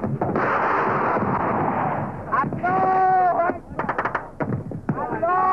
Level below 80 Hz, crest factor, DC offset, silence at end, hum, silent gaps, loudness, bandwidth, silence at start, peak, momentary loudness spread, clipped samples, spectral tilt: -48 dBFS; 12 dB; under 0.1%; 0 s; none; none; -22 LUFS; 6.4 kHz; 0 s; -10 dBFS; 9 LU; under 0.1%; -9 dB/octave